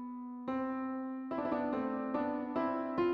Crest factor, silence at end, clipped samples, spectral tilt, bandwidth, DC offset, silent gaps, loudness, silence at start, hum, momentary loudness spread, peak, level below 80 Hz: 14 dB; 0 s; under 0.1%; -8.5 dB/octave; 5.4 kHz; under 0.1%; none; -37 LUFS; 0 s; none; 5 LU; -22 dBFS; -70 dBFS